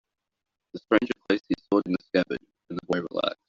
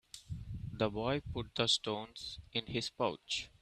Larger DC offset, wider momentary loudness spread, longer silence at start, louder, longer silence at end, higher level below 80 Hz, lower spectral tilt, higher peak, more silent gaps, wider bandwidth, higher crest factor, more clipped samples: neither; about the same, 14 LU vs 14 LU; first, 0.75 s vs 0.15 s; first, -27 LUFS vs -37 LUFS; about the same, 0.15 s vs 0.15 s; second, -62 dBFS vs -56 dBFS; about the same, -4 dB/octave vs -4 dB/octave; first, -4 dBFS vs -16 dBFS; neither; second, 7.4 kHz vs 14 kHz; about the same, 24 dB vs 22 dB; neither